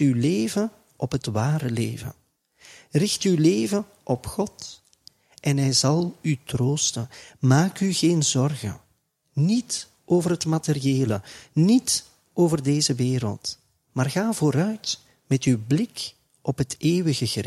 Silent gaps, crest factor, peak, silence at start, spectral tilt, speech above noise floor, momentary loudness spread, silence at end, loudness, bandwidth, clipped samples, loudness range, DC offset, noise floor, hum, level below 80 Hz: none; 18 dB; -4 dBFS; 0 s; -5 dB/octave; 46 dB; 13 LU; 0 s; -24 LUFS; 15 kHz; under 0.1%; 3 LU; under 0.1%; -68 dBFS; none; -56 dBFS